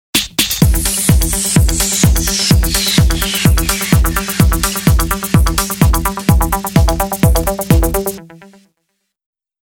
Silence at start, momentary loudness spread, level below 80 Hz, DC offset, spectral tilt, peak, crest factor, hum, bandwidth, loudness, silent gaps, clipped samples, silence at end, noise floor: 0.15 s; 3 LU; -18 dBFS; under 0.1%; -4 dB/octave; 0 dBFS; 14 dB; none; over 20 kHz; -13 LUFS; none; under 0.1%; 1.3 s; -69 dBFS